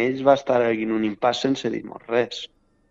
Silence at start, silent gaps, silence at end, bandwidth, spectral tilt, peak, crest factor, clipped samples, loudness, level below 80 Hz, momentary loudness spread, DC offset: 0 s; none; 0.45 s; 7.8 kHz; -5.5 dB/octave; -4 dBFS; 20 dB; under 0.1%; -22 LUFS; -60 dBFS; 12 LU; under 0.1%